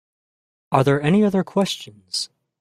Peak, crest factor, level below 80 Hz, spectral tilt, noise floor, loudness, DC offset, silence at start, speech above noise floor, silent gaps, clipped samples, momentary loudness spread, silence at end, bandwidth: -2 dBFS; 20 dB; -58 dBFS; -6 dB/octave; under -90 dBFS; -20 LUFS; under 0.1%; 0.7 s; over 71 dB; none; under 0.1%; 11 LU; 0.35 s; 13.5 kHz